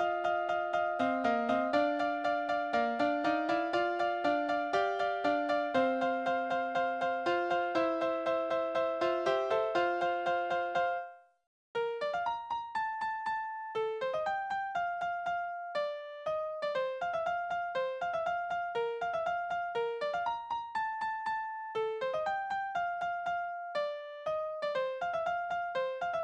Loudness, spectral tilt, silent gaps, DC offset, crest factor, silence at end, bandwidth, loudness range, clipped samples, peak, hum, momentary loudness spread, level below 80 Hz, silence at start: -33 LUFS; -4.5 dB/octave; 11.47-11.74 s; under 0.1%; 18 dB; 0 s; 9 kHz; 4 LU; under 0.1%; -16 dBFS; none; 6 LU; -72 dBFS; 0 s